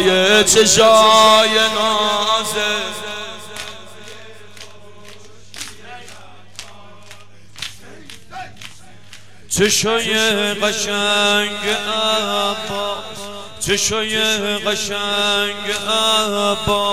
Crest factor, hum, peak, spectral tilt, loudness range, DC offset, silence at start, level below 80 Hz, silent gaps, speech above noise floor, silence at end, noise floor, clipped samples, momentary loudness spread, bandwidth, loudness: 16 dB; none; -2 dBFS; -1.5 dB/octave; 22 LU; 1%; 0 s; -48 dBFS; none; 27 dB; 0 s; -43 dBFS; under 0.1%; 24 LU; 16.5 kHz; -15 LUFS